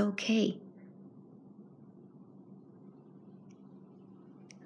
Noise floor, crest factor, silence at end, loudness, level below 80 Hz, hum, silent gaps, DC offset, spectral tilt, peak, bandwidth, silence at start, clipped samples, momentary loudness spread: -55 dBFS; 22 dB; 0 s; -32 LUFS; under -90 dBFS; none; none; under 0.1%; -5 dB/octave; -18 dBFS; 11 kHz; 0 s; under 0.1%; 26 LU